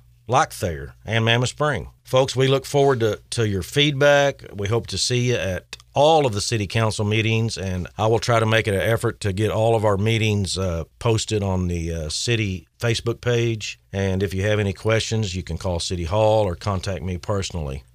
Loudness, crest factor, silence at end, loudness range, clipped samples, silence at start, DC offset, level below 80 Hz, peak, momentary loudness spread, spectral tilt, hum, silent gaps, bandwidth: -21 LUFS; 18 dB; 0.1 s; 4 LU; under 0.1%; 0.3 s; under 0.1%; -42 dBFS; -4 dBFS; 9 LU; -5 dB/octave; none; none; 15 kHz